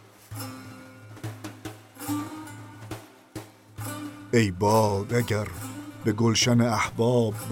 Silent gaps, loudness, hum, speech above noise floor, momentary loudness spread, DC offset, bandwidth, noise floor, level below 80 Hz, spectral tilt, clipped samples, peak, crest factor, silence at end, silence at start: none; -25 LUFS; none; 22 dB; 21 LU; under 0.1%; 17 kHz; -45 dBFS; -58 dBFS; -5 dB/octave; under 0.1%; -10 dBFS; 18 dB; 0 s; 0.3 s